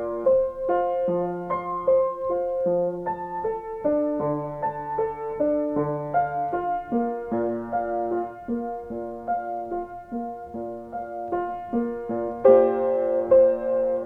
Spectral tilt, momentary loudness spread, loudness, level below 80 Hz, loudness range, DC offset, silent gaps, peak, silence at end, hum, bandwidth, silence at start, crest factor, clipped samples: -10 dB/octave; 14 LU; -25 LUFS; -54 dBFS; 8 LU; under 0.1%; none; -4 dBFS; 0 s; none; 3.4 kHz; 0 s; 20 dB; under 0.1%